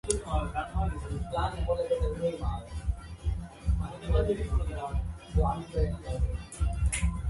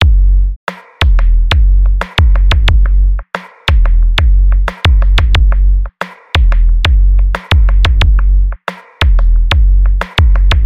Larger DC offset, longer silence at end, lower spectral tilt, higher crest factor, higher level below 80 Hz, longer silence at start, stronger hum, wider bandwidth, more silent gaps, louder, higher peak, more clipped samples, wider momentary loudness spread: second, under 0.1% vs 3%; about the same, 0 s vs 0 s; about the same, -6 dB/octave vs -5.5 dB/octave; first, 24 dB vs 6 dB; second, -32 dBFS vs -8 dBFS; about the same, 0.05 s vs 0 s; neither; first, 11.5 kHz vs 6.8 kHz; second, none vs 0.56-0.67 s; second, -32 LUFS vs -12 LUFS; second, -6 dBFS vs -2 dBFS; neither; about the same, 6 LU vs 7 LU